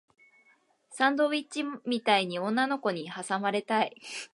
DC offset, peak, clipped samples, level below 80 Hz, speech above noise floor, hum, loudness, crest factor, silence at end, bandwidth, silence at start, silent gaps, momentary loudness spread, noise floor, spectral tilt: under 0.1%; -10 dBFS; under 0.1%; -84 dBFS; 37 dB; none; -29 LUFS; 20 dB; 0.05 s; 11.5 kHz; 0.9 s; none; 9 LU; -66 dBFS; -4 dB/octave